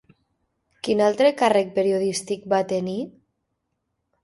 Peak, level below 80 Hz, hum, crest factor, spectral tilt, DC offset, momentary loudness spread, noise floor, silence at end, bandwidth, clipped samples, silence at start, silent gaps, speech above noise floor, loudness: -6 dBFS; -66 dBFS; none; 18 dB; -4.5 dB/octave; under 0.1%; 12 LU; -77 dBFS; 1.15 s; 11.5 kHz; under 0.1%; 0.85 s; none; 56 dB; -22 LUFS